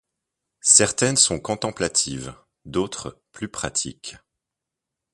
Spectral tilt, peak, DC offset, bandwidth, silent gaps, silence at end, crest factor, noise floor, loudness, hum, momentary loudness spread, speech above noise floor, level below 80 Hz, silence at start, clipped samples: -2 dB/octave; 0 dBFS; under 0.1%; 11.5 kHz; none; 1 s; 24 dB; -85 dBFS; -20 LUFS; none; 22 LU; 63 dB; -52 dBFS; 0.65 s; under 0.1%